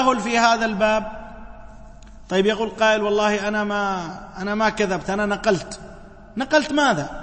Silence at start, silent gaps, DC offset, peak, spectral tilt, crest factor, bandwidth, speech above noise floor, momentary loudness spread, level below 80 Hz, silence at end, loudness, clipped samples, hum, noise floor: 0 s; none; under 0.1%; -4 dBFS; -4 dB/octave; 18 dB; 8.8 kHz; 21 dB; 16 LU; -44 dBFS; 0 s; -21 LUFS; under 0.1%; none; -41 dBFS